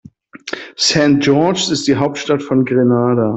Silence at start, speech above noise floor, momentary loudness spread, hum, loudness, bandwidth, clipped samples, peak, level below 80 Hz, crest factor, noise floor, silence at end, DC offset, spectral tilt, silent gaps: 0.45 s; 22 dB; 15 LU; none; -14 LUFS; 8.4 kHz; under 0.1%; 0 dBFS; -52 dBFS; 14 dB; -35 dBFS; 0 s; under 0.1%; -5 dB/octave; none